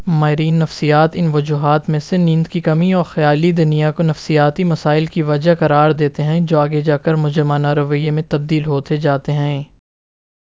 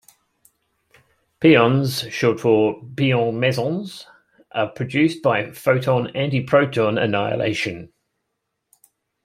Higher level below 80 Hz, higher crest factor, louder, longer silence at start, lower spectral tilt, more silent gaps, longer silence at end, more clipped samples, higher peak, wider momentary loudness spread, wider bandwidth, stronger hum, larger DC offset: first, -48 dBFS vs -62 dBFS; second, 14 dB vs 20 dB; first, -15 LUFS vs -20 LUFS; second, 0 s vs 1.4 s; first, -8 dB/octave vs -6.5 dB/octave; neither; second, 0.75 s vs 1.4 s; neither; about the same, 0 dBFS vs -2 dBFS; second, 4 LU vs 10 LU; second, 7.6 kHz vs 16 kHz; neither; first, 0.2% vs under 0.1%